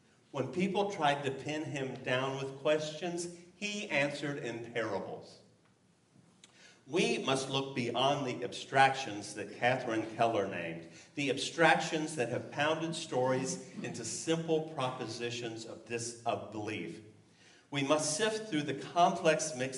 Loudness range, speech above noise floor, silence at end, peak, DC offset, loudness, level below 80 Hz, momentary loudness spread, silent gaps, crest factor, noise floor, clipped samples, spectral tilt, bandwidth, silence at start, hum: 6 LU; 34 dB; 0 s; -10 dBFS; under 0.1%; -34 LUFS; -78 dBFS; 12 LU; none; 24 dB; -68 dBFS; under 0.1%; -4 dB/octave; 11.5 kHz; 0.35 s; none